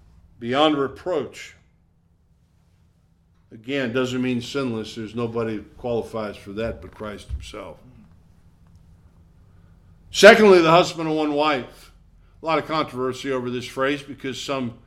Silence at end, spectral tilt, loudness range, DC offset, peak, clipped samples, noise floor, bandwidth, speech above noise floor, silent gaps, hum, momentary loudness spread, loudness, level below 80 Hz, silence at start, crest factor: 0.15 s; -4.5 dB/octave; 17 LU; under 0.1%; 0 dBFS; under 0.1%; -60 dBFS; 15 kHz; 39 dB; none; none; 22 LU; -21 LUFS; -48 dBFS; 0.4 s; 22 dB